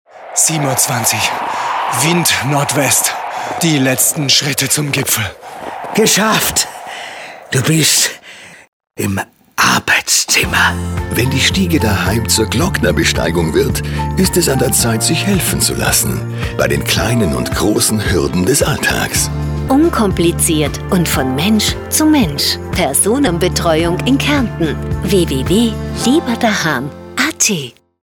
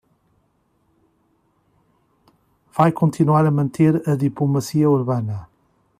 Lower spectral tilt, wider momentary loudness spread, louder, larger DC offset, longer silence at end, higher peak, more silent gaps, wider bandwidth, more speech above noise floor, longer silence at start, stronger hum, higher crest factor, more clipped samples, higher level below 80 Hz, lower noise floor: second, -3.5 dB/octave vs -8.5 dB/octave; about the same, 8 LU vs 8 LU; first, -13 LUFS vs -19 LUFS; neither; second, 0.35 s vs 0.55 s; first, 0 dBFS vs -4 dBFS; first, 8.68-8.80 s vs none; first, 19.5 kHz vs 14.5 kHz; second, 23 dB vs 47 dB; second, 0.15 s vs 2.75 s; neither; about the same, 14 dB vs 18 dB; neither; first, -32 dBFS vs -58 dBFS; second, -36 dBFS vs -65 dBFS